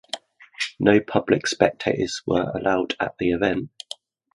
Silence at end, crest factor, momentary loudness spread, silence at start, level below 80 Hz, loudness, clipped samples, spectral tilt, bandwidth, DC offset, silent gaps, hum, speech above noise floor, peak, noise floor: 0.65 s; 22 dB; 16 LU; 0.15 s; -52 dBFS; -22 LUFS; under 0.1%; -5 dB/octave; 11.5 kHz; under 0.1%; none; none; 21 dB; 0 dBFS; -42 dBFS